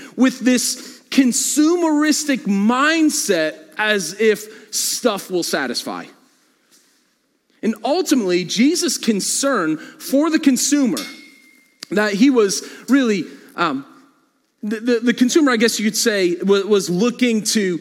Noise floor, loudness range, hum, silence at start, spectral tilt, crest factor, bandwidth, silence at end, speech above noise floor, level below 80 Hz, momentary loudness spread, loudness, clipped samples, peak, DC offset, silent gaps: -64 dBFS; 5 LU; none; 0 s; -3.5 dB/octave; 16 dB; 17 kHz; 0 s; 46 dB; -76 dBFS; 9 LU; -18 LUFS; under 0.1%; -2 dBFS; under 0.1%; none